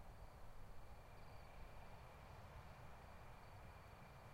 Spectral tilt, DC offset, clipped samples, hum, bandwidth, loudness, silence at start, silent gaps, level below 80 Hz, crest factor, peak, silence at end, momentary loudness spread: -5.5 dB/octave; under 0.1%; under 0.1%; none; 16 kHz; -61 LUFS; 0 s; none; -62 dBFS; 12 dB; -44 dBFS; 0 s; 2 LU